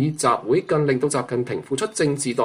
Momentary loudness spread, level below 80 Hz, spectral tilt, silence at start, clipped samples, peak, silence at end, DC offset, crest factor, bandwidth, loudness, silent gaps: 6 LU; -60 dBFS; -5 dB/octave; 0 s; under 0.1%; -6 dBFS; 0 s; under 0.1%; 16 dB; 15.5 kHz; -22 LUFS; none